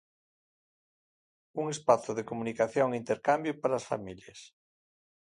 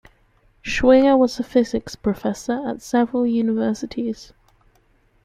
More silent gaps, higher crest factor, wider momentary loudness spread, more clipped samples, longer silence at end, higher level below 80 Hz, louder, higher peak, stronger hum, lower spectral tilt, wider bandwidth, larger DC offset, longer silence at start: neither; first, 24 dB vs 18 dB; first, 17 LU vs 13 LU; neither; second, 0.8 s vs 1 s; second, -72 dBFS vs -46 dBFS; second, -31 LUFS vs -20 LUFS; second, -8 dBFS vs -2 dBFS; neither; about the same, -5 dB/octave vs -5.5 dB/octave; second, 11 kHz vs 13 kHz; neither; first, 1.55 s vs 0.65 s